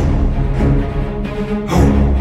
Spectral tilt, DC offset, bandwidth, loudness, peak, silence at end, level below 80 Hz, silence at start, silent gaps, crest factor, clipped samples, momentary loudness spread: -8 dB/octave; under 0.1%; 12.5 kHz; -16 LUFS; -2 dBFS; 0 s; -18 dBFS; 0 s; none; 12 dB; under 0.1%; 8 LU